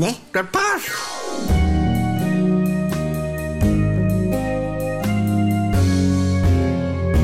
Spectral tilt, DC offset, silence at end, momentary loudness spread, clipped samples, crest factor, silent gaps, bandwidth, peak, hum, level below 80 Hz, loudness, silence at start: -6.5 dB/octave; under 0.1%; 0 s; 6 LU; under 0.1%; 10 dB; none; 16 kHz; -8 dBFS; none; -30 dBFS; -20 LUFS; 0 s